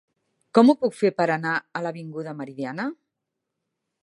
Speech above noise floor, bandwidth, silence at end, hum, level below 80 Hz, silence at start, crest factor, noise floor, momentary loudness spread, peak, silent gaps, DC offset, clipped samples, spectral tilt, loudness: 60 dB; 11.5 kHz; 1.1 s; none; -76 dBFS; 0.55 s; 22 dB; -82 dBFS; 16 LU; -2 dBFS; none; under 0.1%; under 0.1%; -6.5 dB/octave; -23 LUFS